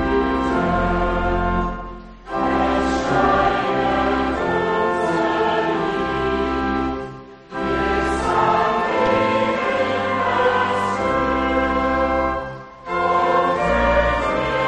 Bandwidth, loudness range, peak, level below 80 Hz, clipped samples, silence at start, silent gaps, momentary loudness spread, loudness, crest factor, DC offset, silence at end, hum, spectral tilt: 10.5 kHz; 2 LU; -4 dBFS; -34 dBFS; under 0.1%; 0 s; none; 8 LU; -19 LUFS; 14 dB; under 0.1%; 0 s; none; -6 dB/octave